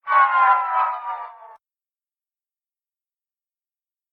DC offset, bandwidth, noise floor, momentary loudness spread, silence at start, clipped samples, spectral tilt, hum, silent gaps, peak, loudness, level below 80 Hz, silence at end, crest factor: under 0.1%; 4.9 kHz; under -90 dBFS; 17 LU; 0.05 s; under 0.1%; -1 dB/octave; none; none; -4 dBFS; -18 LUFS; -86 dBFS; 2.65 s; 18 dB